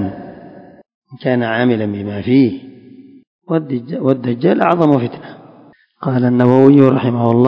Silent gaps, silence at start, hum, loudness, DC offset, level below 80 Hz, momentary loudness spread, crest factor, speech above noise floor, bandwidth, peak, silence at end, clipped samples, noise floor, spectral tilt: 0.94-1.02 s, 3.27-3.42 s; 0 s; none; -14 LUFS; under 0.1%; -52 dBFS; 15 LU; 14 dB; 33 dB; 5.4 kHz; 0 dBFS; 0 s; 0.4%; -46 dBFS; -10 dB/octave